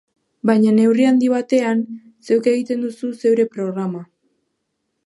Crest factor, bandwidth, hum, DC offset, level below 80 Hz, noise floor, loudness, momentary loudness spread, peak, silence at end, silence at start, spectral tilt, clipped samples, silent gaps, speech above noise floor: 16 dB; 11.5 kHz; none; under 0.1%; -74 dBFS; -73 dBFS; -18 LUFS; 12 LU; -2 dBFS; 1 s; 0.45 s; -7 dB/octave; under 0.1%; none; 57 dB